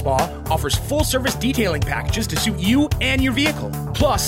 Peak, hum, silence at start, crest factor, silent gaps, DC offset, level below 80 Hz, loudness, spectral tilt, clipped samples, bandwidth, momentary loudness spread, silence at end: -4 dBFS; none; 0 s; 16 dB; none; under 0.1%; -30 dBFS; -20 LUFS; -4.5 dB/octave; under 0.1%; 16 kHz; 4 LU; 0 s